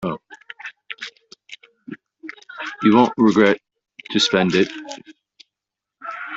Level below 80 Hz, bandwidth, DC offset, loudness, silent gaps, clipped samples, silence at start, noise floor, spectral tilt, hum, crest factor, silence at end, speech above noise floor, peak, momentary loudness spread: -62 dBFS; 8 kHz; under 0.1%; -17 LUFS; none; under 0.1%; 0 s; -86 dBFS; -5 dB/octave; none; 20 dB; 0 s; 69 dB; -2 dBFS; 24 LU